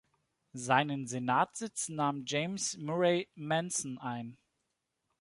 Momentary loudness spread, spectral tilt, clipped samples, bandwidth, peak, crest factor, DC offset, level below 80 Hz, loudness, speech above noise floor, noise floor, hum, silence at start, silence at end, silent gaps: 11 LU; -4 dB/octave; under 0.1%; 11.5 kHz; -12 dBFS; 22 dB; under 0.1%; -78 dBFS; -33 LUFS; 50 dB; -84 dBFS; none; 0.55 s; 0.85 s; none